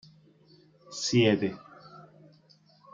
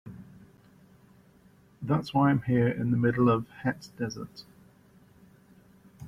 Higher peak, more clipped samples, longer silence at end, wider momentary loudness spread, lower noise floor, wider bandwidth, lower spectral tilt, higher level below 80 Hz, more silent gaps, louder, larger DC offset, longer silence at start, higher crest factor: about the same, -10 dBFS vs -12 dBFS; neither; first, 0.95 s vs 0 s; first, 27 LU vs 20 LU; about the same, -61 dBFS vs -59 dBFS; second, 9.4 kHz vs 11.5 kHz; second, -5 dB/octave vs -8 dB/octave; second, -70 dBFS vs -60 dBFS; neither; about the same, -26 LUFS vs -27 LUFS; neither; first, 0.9 s vs 0.05 s; about the same, 22 dB vs 18 dB